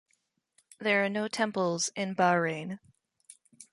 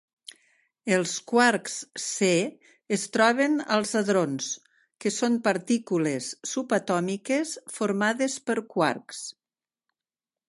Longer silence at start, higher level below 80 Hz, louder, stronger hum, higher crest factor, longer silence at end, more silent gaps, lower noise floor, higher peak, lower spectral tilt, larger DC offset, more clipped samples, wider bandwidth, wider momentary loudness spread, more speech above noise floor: about the same, 0.8 s vs 0.85 s; about the same, -76 dBFS vs -76 dBFS; second, -29 LUFS vs -26 LUFS; neither; about the same, 18 dB vs 20 dB; second, 0.1 s vs 1.2 s; neither; second, -76 dBFS vs under -90 dBFS; second, -12 dBFS vs -6 dBFS; about the same, -4 dB/octave vs -4 dB/octave; neither; neither; about the same, 11.5 kHz vs 11.5 kHz; about the same, 11 LU vs 11 LU; second, 47 dB vs over 64 dB